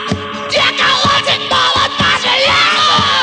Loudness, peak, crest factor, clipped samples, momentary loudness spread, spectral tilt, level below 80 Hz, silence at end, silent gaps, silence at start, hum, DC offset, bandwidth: -10 LUFS; -2 dBFS; 10 dB; under 0.1%; 4 LU; -2.5 dB/octave; -42 dBFS; 0 s; none; 0 s; none; under 0.1%; 10.5 kHz